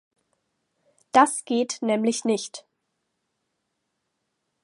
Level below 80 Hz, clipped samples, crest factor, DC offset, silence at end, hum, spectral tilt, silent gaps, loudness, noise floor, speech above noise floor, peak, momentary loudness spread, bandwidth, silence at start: -78 dBFS; under 0.1%; 24 dB; under 0.1%; 2.05 s; none; -3.5 dB/octave; none; -23 LUFS; -78 dBFS; 56 dB; -4 dBFS; 12 LU; 11.5 kHz; 1.15 s